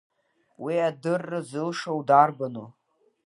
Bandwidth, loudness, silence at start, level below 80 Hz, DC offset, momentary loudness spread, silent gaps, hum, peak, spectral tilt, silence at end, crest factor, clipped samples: 11.5 kHz; -25 LUFS; 0.6 s; -80 dBFS; under 0.1%; 15 LU; none; none; -4 dBFS; -6 dB/octave; 0.55 s; 22 dB; under 0.1%